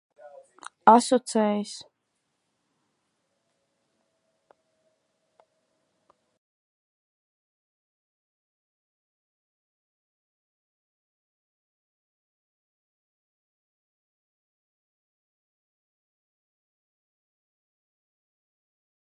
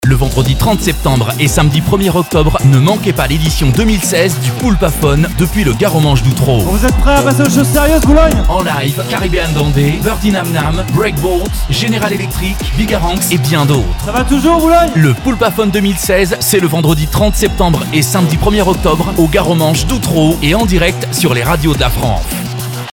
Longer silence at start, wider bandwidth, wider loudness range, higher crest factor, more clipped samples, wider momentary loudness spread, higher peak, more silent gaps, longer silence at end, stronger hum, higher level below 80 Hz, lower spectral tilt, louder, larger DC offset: first, 0.85 s vs 0 s; second, 11 kHz vs 19 kHz; first, 16 LU vs 3 LU; first, 32 dB vs 10 dB; neither; first, 18 LU vs 5 LU; about the same, -2 dBFS vs 0 dBFS; neither; first, 17.3 s vs 0 s; neither; second, -88 dBFS vs -18 dBFS; about the same, -4.5 dB/octave vs -5.5 dB/octave; second, -22 LUFS vs -11 LUFS; neither